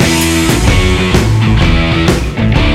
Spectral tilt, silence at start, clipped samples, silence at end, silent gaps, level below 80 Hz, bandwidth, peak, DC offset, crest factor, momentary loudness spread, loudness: -5 dB/octave; 0 s; under 0.1%; 0 s; none; -16 dBFS; 16 kHz; 0 dBFS; under 0.1%; 10 dB; 2 LU; -10 LUFS